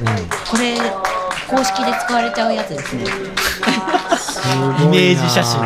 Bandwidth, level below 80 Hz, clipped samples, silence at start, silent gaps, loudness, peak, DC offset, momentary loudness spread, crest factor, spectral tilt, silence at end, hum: 16 kHz; -44 dBFS; under 0.1%; 0 s; none; -17 LUFS; -2 dBFS; under 0.1%; 9 LU; 16 dB; -4.5 dB/octave; 0 s; none